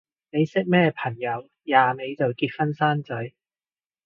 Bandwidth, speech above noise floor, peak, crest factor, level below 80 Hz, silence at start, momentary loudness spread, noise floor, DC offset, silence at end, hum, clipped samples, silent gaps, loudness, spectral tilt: 7 kHz; over 67 dB; -4 dBFS; 22 dB; -68 dBFS; 0.35 s; 12 LU; under -90 dBFS; under 0.1%; 0.75 s; none; under 0.1%; none; -24 LUFS; -8 dB/octave